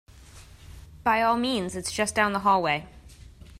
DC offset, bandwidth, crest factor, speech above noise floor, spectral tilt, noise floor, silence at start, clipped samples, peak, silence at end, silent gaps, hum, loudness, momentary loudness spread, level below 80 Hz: under 0.1%; 16 kHz; 20 dB; 24 dB; -3.5 dB/octave; -48 dBFS; 0.15 s; under 0.1%; -8 dBFS; 0.05 s; none; none; -25 LUFS; 7 LU; -52 dBFS